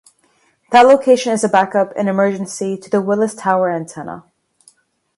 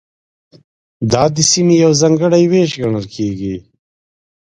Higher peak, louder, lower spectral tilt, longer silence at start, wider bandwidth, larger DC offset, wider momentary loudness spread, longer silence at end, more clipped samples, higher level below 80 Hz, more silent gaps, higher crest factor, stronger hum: about the same, 0 dBFS vs 0 dBFS; about the same, -15 LUFS vs -13 LUFS; about the same, -5 dB/octave vs -5 dB/octave; second, 0.7 s vs 1 s; about the same, 11.5 kHz vs 11 kHz; neither; first, 16 LU vs 12 LU; first, 0.95 s vs 0.8 s; neither; second, -64 dBFS vs -46 dBFS; neither; about the same, 16 dB vs 14 dB; neither